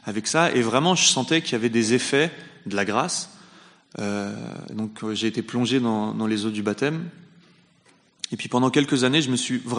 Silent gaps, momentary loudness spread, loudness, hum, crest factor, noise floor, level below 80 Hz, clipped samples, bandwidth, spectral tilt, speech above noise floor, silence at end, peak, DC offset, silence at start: none; 13 LU; -23 LUFS; none; 20 dB; -59 dBFS; -68 dBFS; under 0.1%; 10.5 kHz; -3.5 dB/octave; 36 dB; 0 s; -4 dBFS; under 0.1%; 0.05 s